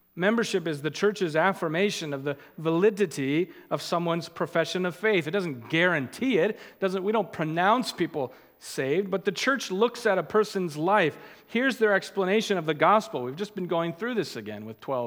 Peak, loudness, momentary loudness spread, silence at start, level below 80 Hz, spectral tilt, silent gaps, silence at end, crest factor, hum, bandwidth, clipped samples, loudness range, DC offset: -6 dBFS; -26 LUFS; 9 LU; 0.15 s; -76 dBFS; -5 dB/octave; none; 0 s; 20 dB; none; 18 kHz; under 0.1%; 2 LU; under 0.1%